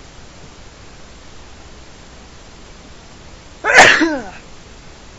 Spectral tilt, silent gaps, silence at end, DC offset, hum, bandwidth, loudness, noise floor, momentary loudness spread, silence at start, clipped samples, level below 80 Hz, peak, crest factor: -2 dB/octave; none; 0.8 s; under 0.1%; none; 11 kHz; -10 LUFS; -39 dBFS; 20 LU; 3.65 s; 0.2%; -42 dBFS; 0 dBFS; 20 dB